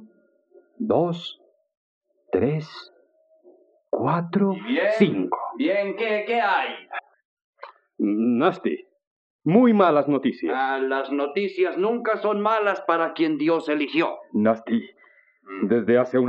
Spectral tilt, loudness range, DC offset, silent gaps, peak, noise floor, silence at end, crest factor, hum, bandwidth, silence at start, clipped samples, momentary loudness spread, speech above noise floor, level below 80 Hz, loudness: -8 dB/octave; 7 LU; under 0.1%; 1.77-2.01 s, 7.25-7.37 s, 7.44-7.53 s, 9.07-9.39 s; -4 dBFS; -60 dBFS; 0 s; 20 dB; none; 8 kHz; 0 s; under 0.1%; 10 LU; 38 dB; -72 dBFS; -23 LUFS